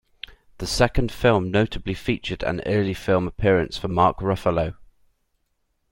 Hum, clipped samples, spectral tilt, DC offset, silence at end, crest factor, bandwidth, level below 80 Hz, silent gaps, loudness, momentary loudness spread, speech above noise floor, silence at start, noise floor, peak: none; under 0.1%; -6 dB/octave; under 0.1%; 1.05 s; 20 dB; 16.5 kHz; -36 dBFS; none; -22 LUFS; 9 LU; 50 dB; 0.6 s; -71 dBFS; -4 dBFS